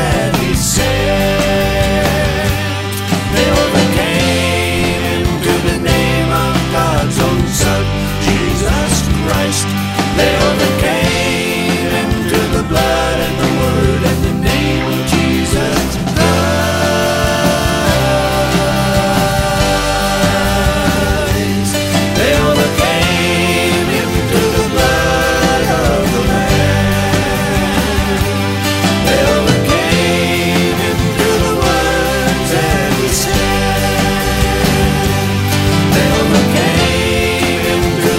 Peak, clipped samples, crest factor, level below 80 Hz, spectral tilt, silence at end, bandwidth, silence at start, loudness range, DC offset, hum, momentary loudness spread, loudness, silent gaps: 0 dBFS; under 0.1%; 12 dB; -24 dBFS; -4.5 dB/octave; 0 s; 16.5 kHz; 0 s; 1 LU; under 0.1%; none; 3 LU; -13 LUFS; none